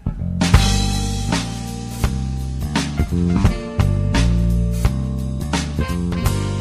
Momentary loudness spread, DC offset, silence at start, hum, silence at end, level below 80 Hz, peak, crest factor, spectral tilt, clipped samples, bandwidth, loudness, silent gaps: 8 LU; under 0.1%; 0 s; none; 0 s; -22 dBFS; 0 dBFS; 18 dB; -5.5 dB/octave; under 0.1%; 15.5 kHz; -20 LUFS; none